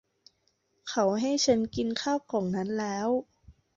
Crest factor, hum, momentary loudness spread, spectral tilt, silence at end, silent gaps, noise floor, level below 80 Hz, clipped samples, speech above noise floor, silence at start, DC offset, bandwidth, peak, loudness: 18 dB; none; 7 LU; -4.5 dB/octave; 0.25 s; none; -73 dBFS; -62 dBFS; under 0.1%; 45 dB; 0.85 s; under 0.1%; 7.8 kHz; -12 dBFS; -29 LUFS